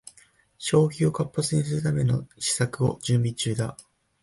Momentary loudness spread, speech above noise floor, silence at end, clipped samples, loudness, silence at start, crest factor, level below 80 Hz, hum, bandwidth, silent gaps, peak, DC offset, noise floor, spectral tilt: 5 LU; 34 dB; 0.4 s; under 0.1%; -25 LUFS; 0.6 s; 16 dB; -54 dBFS; none; 11.5 kHz; none; -10 dBFS; under 0.1%; -58 dBFS; -5.5 dB/octave